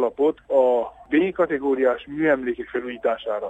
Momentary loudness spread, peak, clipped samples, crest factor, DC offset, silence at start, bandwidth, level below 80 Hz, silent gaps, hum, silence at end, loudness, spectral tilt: 6 LU; -8 dBFS; under 0.1%; 14 dB; under 0.1%; 0 s; 7.8 kHz; -56 dBFS; none; none; 0 s; -22 LUFS; -7.5 dB/octave